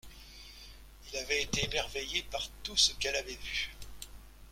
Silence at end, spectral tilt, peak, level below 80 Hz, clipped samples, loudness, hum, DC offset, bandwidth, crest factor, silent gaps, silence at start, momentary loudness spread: 0 s; -1 dB/octave; -14 dBFS; -50 dBFS; under 0.1%; -32 LUFS; none; under 0.1%; 16.5 kHz; 24 dB; none; 0.05 s; 23 LU